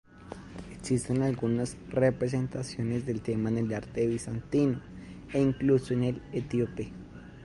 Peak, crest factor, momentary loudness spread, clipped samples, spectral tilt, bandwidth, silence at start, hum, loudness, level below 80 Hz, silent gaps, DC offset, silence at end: -12 dBFS; 18 dB; 17 LU; under 0.1%; -7 dB/octave; 11.5 kHz; 0.15 s; none; -30 LUFS; -52 dBFS; none; under 0.1%; 0 s